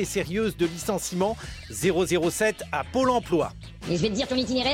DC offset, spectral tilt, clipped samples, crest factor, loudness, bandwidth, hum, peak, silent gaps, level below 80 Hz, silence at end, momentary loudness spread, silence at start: under 0.1%; -4.5 dB/octave; under 0.1%; 14 dB; -26 LUFS; 16.5 kHz; none; -10 dBFS; none; -46 dBFS; 0 s; 8 LU; 0 s